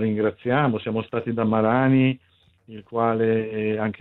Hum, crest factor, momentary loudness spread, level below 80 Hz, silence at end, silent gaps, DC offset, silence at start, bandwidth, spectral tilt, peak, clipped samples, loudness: none; 18 dB; 8 LU; -62 dBFS; 0.1 s; none; under 0.1%; 0 s; 4.2 kHz; -11 dB/octave; -6 dBFS; under 0.1%; -22 LUFS